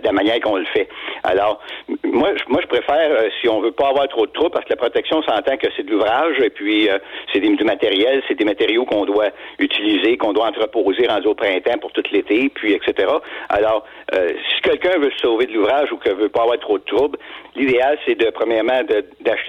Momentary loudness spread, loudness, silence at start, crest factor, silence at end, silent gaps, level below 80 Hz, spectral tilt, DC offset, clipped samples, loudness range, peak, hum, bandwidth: 5 LU; -18 LUFS; 0 s; 10 dB; 0 s; none; -54 dBFS; -5.5 dB/octave; under 0.1%; under 0.1%; 1 LU; -6 dBFS; none; 6.6 kHz